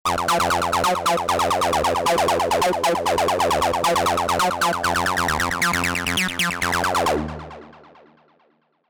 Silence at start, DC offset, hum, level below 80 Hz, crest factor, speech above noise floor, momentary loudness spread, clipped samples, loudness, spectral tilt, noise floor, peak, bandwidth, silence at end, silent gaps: 0.05 s; under 0.1%; none; -44 dBFS; 10 dB; 43 dB; 2 LU; under 0.1%; -20 LUFS; -3 dB/octave; -63 dBFS; -12 dBFS; over 20 kHz; 1.15 s; none